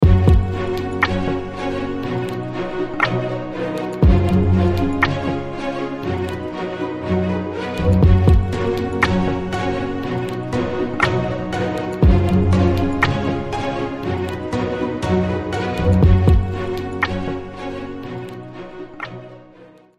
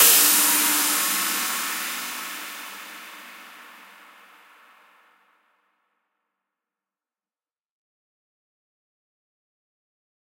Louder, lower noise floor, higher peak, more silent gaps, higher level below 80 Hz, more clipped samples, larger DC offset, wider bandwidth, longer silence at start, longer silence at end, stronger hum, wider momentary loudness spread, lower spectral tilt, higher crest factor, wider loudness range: about the same, -20 LUFS vs -19 LUFS; second, -45 dBFS vs under -90 dBFS; about the same, 0 dBFS vs -2 dBFS; neither; first, -26 dBFS vs under -90 dBFS; neither; neither; second, 10 kHz vs 16 kHz; about the same, 0 s vs 0 s; second, 0.35 s vs 6.6 s; neither; second, 12 LU vs 25 LU; first, -7.5 dB/octave vs 1.5 dB/octave; second, 18 dB vs 26 dB; second, 4 LU vs 25 LU